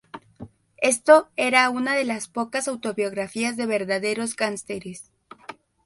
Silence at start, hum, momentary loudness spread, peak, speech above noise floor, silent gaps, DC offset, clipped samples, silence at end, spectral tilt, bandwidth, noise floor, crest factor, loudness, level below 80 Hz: 0.15 s; none; 25 LU; -2 dBFS; 22 dB; none; under 0.1%; under 0.1%; 0.35 s; -3 dB/octave; 12 kHz; -45 dBFS; 22 dB; -22 LUFS; -66 dBFS